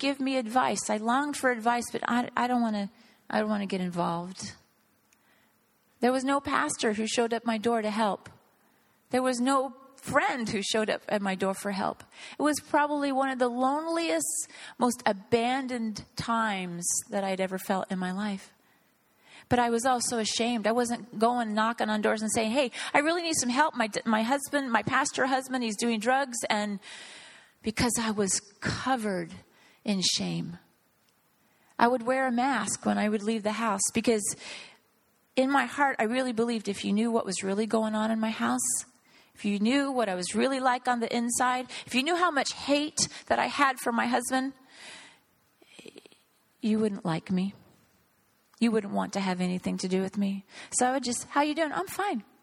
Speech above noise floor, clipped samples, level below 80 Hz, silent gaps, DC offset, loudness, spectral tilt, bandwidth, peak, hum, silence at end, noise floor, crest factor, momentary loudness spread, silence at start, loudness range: 40 dB; under 0.1%; -64 dBFS; none; under 0.1%; -28 LUFS; -3.5 dB/octave; 16.5 kHz; -4 dBFS; none; 0.2 s; -68 dBFS; 24 dB; 8 LU; 0 s; 5 LU